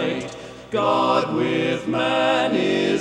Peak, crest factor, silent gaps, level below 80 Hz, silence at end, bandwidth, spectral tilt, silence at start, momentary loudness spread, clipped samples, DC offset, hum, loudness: -4 dBFS; 16 dB; none; -56 dBFS; 0 s; 11 kHz; -5.5 dB/octave; 0 s; 10 LU; under 0.1%; under 0.1%; none; -21 LUFS